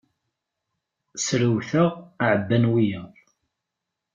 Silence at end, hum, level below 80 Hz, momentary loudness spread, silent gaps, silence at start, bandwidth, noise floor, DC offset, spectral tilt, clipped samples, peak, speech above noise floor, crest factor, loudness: 1.1 s; none; -62 dBFS; 8 LU; none; 1.15 s; 8.8 kHz; -84 dBFS; under 0.1%; -5.5 dB/octave; under 0.1%; -6 dBFS; 62 dB; 18 dB; -22 LUFS